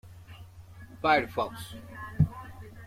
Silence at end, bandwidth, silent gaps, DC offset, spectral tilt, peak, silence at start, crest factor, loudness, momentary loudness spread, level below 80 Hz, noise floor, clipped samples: 0 s; 15.5 kHz; none; under 0.1%; -6.5 dB/octave; -10 dBFS; 0.05 s; 22 dB; -28 LUFS; 24 LU; -52 dBFS; -48 dBFS; under 0.1%